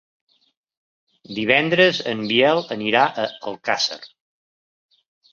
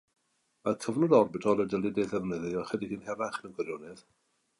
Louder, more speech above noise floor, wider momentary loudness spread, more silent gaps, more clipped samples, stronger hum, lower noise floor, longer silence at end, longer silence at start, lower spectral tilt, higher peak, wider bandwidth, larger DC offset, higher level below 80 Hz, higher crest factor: first, -19 LUFS vs -30 LUFS; first, over 70 dB vs 34 dB; about the same, 11 LU vs 13 LU; neither; neither; neither; first, under -90 dBFS vs -64 dBFS; first, 1.25 s vs 0.6 s; first, 1.3 s vs 0.65 s; second, -4 dB/octave vs -6.5 dB/octave; first, -2 dBFS vs -10 dBFS; second, 7.4 kHz vs 11.5 kHz; neither; about the same, -66 dBFS vs -66 dBFS; about the same, 22 dB vs 20 dB